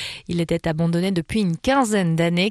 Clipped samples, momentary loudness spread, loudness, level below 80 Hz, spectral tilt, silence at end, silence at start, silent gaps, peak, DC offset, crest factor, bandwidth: under 0.1%; 5 LU; -21 LUFS; -46 dBFS; -6 dB/octave; 0 s; 0 s; none; -8 dBFS; under 0.1%; 14 dB; 13 kHz